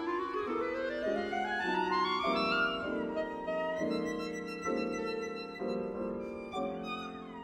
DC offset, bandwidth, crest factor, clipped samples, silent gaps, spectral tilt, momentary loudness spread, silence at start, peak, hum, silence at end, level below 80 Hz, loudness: under 0.1%; 14.5 kHz; 14 dB; under 0.1%; none; -5 dB/octave; 8 LU; 0 s; -20 dBFS; none; 0 s; -62 dBFS; -35 LUFS